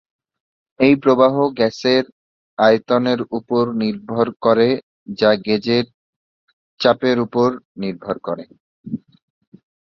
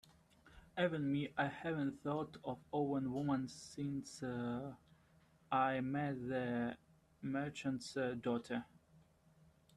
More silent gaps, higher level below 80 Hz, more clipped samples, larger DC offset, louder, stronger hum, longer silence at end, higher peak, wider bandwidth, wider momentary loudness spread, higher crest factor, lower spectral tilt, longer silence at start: first, 2.12-2.57 s, 4.36-4.40 s, 4.83-5.06 s, 5.94-6.77 s, 7.65-7.75 s, 8.60-8.84 s vs none; first, -60 dBFS vs -74 dBFS; neither; neither; first, -18 LUFS vs -41 LUFS; neither; about the same, 0.85 s vs 0.75 s; first, -2 dBFS vs -22 dBFS; second, 7 kHz vs 12 kHz; first, 16 LU vs 10 LU; about the same, 18 dB vs 18 dB; about the same, -6.5 dB/octave vs -6.5 dB/octave; first, 0.8 s vs 0.45 s